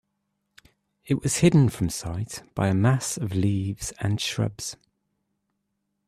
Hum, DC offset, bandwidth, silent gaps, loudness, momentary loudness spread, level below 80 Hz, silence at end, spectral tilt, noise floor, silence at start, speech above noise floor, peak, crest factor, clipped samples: none; under 0.1%; 14 kHz; none; -25 LUFS; 13 LU; -52 dBFS; 1.35 s; -5.5 dB/octave; -78 dBFS; 1.05 s; 54 dB; -6 dBFS; 20 dB; under 0.1%